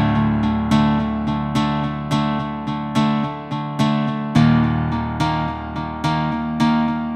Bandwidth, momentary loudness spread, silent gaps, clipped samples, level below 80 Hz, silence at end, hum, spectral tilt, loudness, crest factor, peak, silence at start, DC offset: 10.5 kHz; 8 LU; none; under 0.1%; -36 dBFS; 0 s; none; -7 dB/octave; -20 LUFS; 16 dB; -2 dBFS; 0 s; under 0.1%